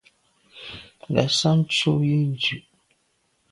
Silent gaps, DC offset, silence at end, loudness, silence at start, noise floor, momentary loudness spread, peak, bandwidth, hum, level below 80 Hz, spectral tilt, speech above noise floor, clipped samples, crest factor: none; under 0.1%; 0.9 s; -21 LUFS; 0.55 s; -69 dBFS; 19 LU; -4 dBFS; 11.5 kHz; none; -58 dBFS; -5 dB/octave; 47 dB; under 0.1%; 20 dB